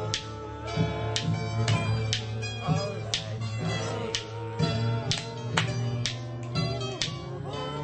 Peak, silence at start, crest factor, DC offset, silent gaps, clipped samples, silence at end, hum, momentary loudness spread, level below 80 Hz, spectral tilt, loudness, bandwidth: -4 dBFS; 0 s; 26 dB; under 0.1%; none; under 0.1%; 0 s; none; 7 LU; -48 dBFS; -4.5 dB/octave; -30 LUFS; 8.8 kHz